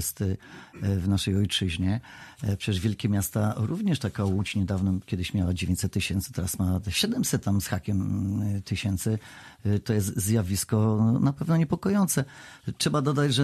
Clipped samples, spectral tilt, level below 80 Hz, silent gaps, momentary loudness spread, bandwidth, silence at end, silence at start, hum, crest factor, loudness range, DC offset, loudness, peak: under 0.1%; -5.5 dB/octave; -48 dBFS; none; 7 LU; 13.5 kHz; 0 s; 0 s; none; 14 dB; 3 LU; under 0.1%; -27 LUFS; -12 dBFS